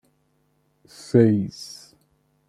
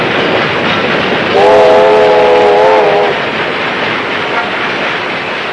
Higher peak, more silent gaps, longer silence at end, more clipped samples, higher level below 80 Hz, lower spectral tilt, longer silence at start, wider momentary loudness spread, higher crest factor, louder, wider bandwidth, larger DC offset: second, -4 dBFS vs 0 dBFS; neither; first, 0.85 s vs 0 s; second, under 0.1% vs 0.9%; second, -62 dBFS vs -46 dBFS; first, -7.5 dB/octave vs -5 dB/octave; first, 1.15 s vs 0 s; first, 25 LU vs 8 LU; first, 20 dB vs 10 dB; second, -20 LUFS vs -9 LUFS; first, 12.5 kHz vs 10.5 kHz; second, under 0.1% vs 0.1%